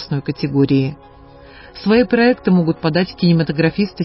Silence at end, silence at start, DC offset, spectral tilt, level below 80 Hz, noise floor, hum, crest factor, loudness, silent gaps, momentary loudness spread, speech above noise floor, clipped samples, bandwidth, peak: 0 s; 0 s; under 0.1%; -11.5 dB/octave; -46 dBFS; -41 dBFS; none; 14 dB; -16 LUFS; none; 8 LU; 25 dB; under 0.1%; 5.8 kHz; -2 dBFS